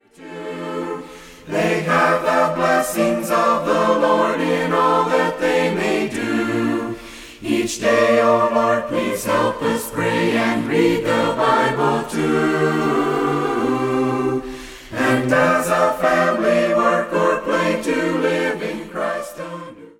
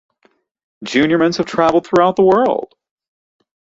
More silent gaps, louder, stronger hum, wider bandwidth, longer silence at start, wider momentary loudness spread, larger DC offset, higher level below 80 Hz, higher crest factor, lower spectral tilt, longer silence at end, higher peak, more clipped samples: neither; second, -18 LUFS vs -14 LUFS; neither; first, 17 kHz vs 7.8 kHz; second, 0.2 s vs 0.8 s; about the same, 11 LU vs 11 LU; neither; about the same, -50 dBFS vs -54 dBFS; about the same, 16 dB vs 16 dB; about the same, -5 dB/octave vs -6 dB/octave; second, 0.1 s vs 1.1 s; about the same, -2 dBFS vs -2 dBFS; neither